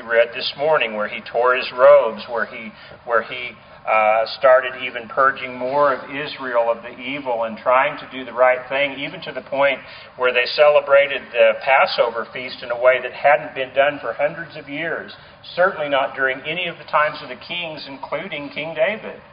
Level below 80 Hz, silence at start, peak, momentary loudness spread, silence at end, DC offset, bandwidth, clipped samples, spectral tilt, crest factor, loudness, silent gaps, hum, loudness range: -62 dBFS; 0 s; 0 dBFS; 14 LU; 0.15 s; under 0.1%; 5.2 kHz; under 0.1%; -0.5 dB/octave; 20 dB; -19 LUFS; none; none; 5 LU